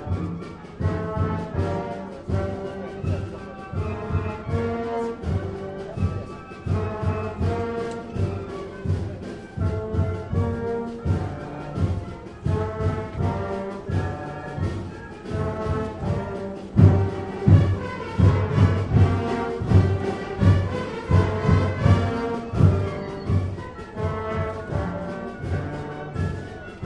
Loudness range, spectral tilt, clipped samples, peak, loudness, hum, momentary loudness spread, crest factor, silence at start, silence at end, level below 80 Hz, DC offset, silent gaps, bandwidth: 8 LU; -8.5 dB/octave; under 0.1%; -2 dBFS; -25 LUFS; none; 13 LU; 22 dB; 0 s; 0 s; -40 dBFS; under 0.1%; none; 8.4 kHz